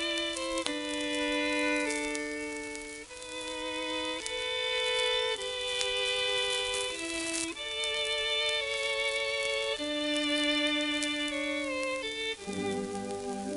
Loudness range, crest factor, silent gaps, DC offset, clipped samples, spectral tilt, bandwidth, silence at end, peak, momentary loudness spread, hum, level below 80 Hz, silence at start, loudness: 3 LU; 26 dB; none; under 0.1%; under 0.1%; -1.5 dB/octave; 12 kHz; 0 s; -6 dBFS; 9 LU; none; -60 dBFS; 0 s; -31 LUFS